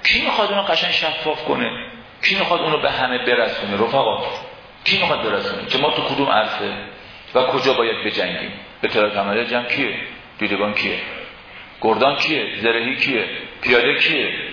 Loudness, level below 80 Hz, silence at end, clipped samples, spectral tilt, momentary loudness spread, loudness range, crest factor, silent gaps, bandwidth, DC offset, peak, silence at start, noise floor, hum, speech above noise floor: -18 LUFS; -52 dBFS; 0 s; under 0.1%; -4.5 dB/octave; 11 LU; 2 LU; 18 dB; none; 5.4 kHz; under 0.1%; -2 dBFS; 0 s; -39 dBFS; none; 20 dB